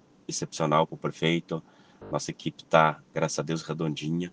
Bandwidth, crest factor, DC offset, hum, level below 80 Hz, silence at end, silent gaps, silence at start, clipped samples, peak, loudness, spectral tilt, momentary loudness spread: 10 kHz; 24 dB; under 0.1%; none; -64 dBFS; 0.05 s; none; 0.3 s; under 0.1%; -6 dBFS; -28 LUFS; -5 dB/octave; 13 LU